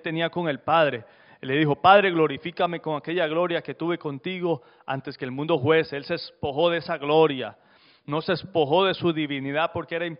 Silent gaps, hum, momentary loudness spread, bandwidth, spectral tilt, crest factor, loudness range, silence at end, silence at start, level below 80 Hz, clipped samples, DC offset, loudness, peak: none; none; 11 LU; 5.4 kHz; -3.5 dB/octave; 22 dB; 5 LU; 0.05 s; 0.05 s; -64 dBFS; under 0.1%; under 0.1%; -24 LUFS; -4 dBFS